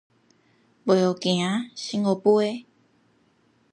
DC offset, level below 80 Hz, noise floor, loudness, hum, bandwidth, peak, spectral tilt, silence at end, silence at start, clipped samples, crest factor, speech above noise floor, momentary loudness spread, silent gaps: under 0.1%; -74 dBFS; -64 dBFS; -23 LUFS; none; 10.5 kHz; -6 dBFS; -5.5 dB/octave; 1.1 s; 0.85 s; under 0.1%; 20 dB; 41 dB; 10 LU; none